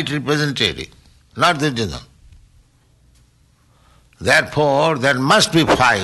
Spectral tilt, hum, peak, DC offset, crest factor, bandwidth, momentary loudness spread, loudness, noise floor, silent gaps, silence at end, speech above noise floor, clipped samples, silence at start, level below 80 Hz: -4 dB/octave; none; -4 dBFS; under 0.1%; 16 dB; 12 kHz; 15 LU; -16 LUFS; -55 dBFS; none; 0 s; 39 dB; under 0.1%; 0 s; -46 dBFS